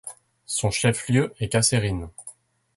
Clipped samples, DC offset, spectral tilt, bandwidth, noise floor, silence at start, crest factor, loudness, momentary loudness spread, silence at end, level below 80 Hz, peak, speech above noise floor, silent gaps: under 0.1%; under 0.1%; -4 dB/octave; 12 kHz; -48 dBFS; 0.05 s; 18 dB; -23 LUFS; 19 LU; 0.45 s; -46 dBFS; -6 dBFS; 25 dB; none